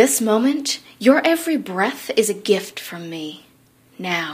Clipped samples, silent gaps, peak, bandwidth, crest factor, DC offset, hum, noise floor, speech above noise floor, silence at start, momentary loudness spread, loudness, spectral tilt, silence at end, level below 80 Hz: under 0.1%; none; 0 dBFS; 15.5 kHz; 20 dB; under 0.1%; none; -54 dBFS; 34 dB; 0 s; 15 LU; -19 LUFS; -3 dB/octave; 0 s; -72 dBFS